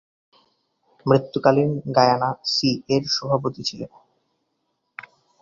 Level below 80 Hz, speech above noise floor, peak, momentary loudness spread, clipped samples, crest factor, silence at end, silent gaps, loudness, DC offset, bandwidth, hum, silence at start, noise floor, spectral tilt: -60 dBFS; 53 dB; -2 dBFS; 21 LU; under 0.1%; 22 dB; 1.55 s; none; -21 LUFS; under 0.1%; 7.6 kHz; none; 1.05 s; -74 dBFS; -5.5 dB/octave